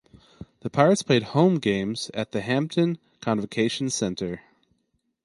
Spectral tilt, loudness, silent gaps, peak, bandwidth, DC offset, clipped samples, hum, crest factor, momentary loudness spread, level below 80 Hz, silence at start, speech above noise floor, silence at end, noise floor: -5.5 dB/octave; -24 LUFS; none; -4 dBFS; 11.5 kHz; under 0.1%; under 0.1%; none; 22 dB; 12 LU; -58 dBFS; 0.4 s; 50 dB; 0.85 s; -73 dBFS